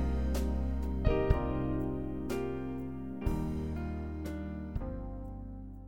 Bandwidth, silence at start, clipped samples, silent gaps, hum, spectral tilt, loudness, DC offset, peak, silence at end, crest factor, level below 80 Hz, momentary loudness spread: 16.5 kHz; 0 s; under 0.1%; none; none; -8 dB/octave; -36 LUFS; 0.4%; -14 dBFS; 0 s; 20 dB; -38 dBFS; 10 LU